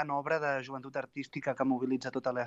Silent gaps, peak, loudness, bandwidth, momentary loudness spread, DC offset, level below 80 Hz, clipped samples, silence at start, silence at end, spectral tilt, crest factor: none; -16 dBFS; -34 LUFS; 7.8 kHz; 8 LU; under 0.1%; -78 dBFS; under 0.1%; 0 s; 0 s; -6.5 dB/octave; 18 dB